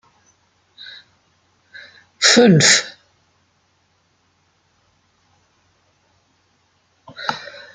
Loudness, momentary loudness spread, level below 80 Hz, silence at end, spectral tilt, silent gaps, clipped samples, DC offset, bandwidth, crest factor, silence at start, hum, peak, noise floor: -13 LUFS; 29 LU; -64 dBFS; 0.35 s; -3 dB/octave; none; under 0.1%; under 0.1%; 12 kHz; 22 dB; 2.2 s; none; 0 dBFS; -63 dBFS